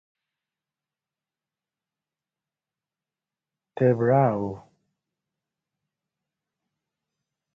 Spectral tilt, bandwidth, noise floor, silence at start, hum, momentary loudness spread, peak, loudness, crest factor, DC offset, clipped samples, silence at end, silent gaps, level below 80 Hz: -11 dB/octave; 5 kHz; under -90 dBFS; 3.75 s; none; 22 LU; -8 dBFS; -22 LUFS; 24 dB; under 0.1%; under 0.1%; 2.95 s; none; -66 dBFS